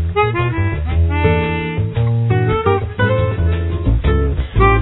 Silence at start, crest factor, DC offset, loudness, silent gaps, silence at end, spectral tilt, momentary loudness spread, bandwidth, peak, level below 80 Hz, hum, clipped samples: 0 s; 14 dB; under 0.1%; -17 LUFS; none; 0 s; -11.5 dB/octave; 4 LU; 4.1 kHz; 0 dBFS; -22 dBFS; none; under 0.1%